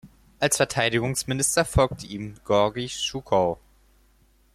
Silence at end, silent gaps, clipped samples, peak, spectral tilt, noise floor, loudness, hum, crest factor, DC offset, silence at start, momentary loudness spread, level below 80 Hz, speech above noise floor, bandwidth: 1 s; none; under 0.1%; -6 dBFS; -3.5 dB/octave; -60 dBFS; -24 LUFS; none; 20 dB; under 0.1%; 0.05 s; 11 LU; -44 dBFS; 36 dB; 15 kHz